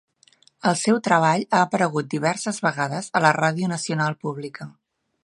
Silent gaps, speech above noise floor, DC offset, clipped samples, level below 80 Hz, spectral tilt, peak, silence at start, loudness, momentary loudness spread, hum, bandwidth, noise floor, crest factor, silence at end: none; 36 dB; under 0.1%; under 0.1%; -70 dBFS; -5 dB/octave; 0 dBFS; 0.65 s; -22 LUFS; 12 LU; none; 11.5 kHz; -58 dBFS; 22 dB; 0.55 s